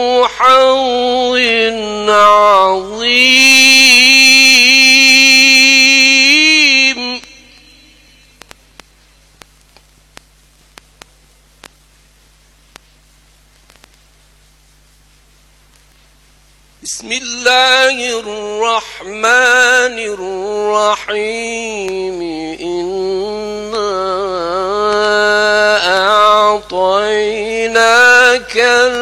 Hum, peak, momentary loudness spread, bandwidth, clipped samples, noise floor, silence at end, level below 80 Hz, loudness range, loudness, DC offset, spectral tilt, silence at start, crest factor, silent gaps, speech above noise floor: none; 0 dBFS; 16 LU; 19 kHz; under 0.1%; -48 dBFS; 0 s; -48 dBFS; 14 LU; -8 LUFS; under 0.1%; -0.5 dB/octave; 0 s; 12 dB; none; 39 dB